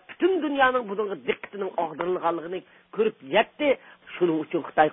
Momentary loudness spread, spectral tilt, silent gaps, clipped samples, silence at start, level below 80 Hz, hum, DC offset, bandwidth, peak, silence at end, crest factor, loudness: 10 LU; -9.5 dB/octave; none; under 0.1%; 0.1 s; -66 dBFS; none; under 0.1%; 3.9 kHz; -6 dBFS; 0 s; 20 dB; -26 LUFS